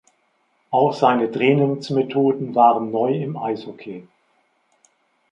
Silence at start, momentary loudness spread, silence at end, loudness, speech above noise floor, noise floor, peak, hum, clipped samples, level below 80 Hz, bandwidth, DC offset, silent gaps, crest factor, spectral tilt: 0.7 s; 16 LU; 1.3 s; -19 LUFS; 47 dB; -65 dBFS; -2 dBFS; none; under 0.1%; -70 dBFS; 8.6 kHz; under 0.1%; none; 18 dB; -7.5 dB/octave